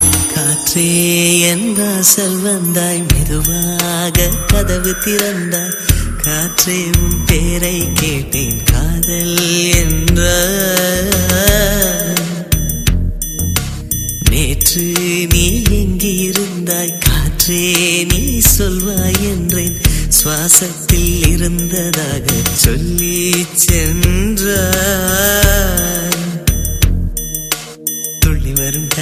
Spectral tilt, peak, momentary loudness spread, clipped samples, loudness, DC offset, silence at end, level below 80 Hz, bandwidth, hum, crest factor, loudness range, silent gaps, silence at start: -3.5 dB/octave; 0 dBFS; 6 LU; under 0.1%; -13 LUFS; under 0.1%; 0 s; -20 dBFS; 16 kHz; none; 14 dB; 3 LU; none; 0 s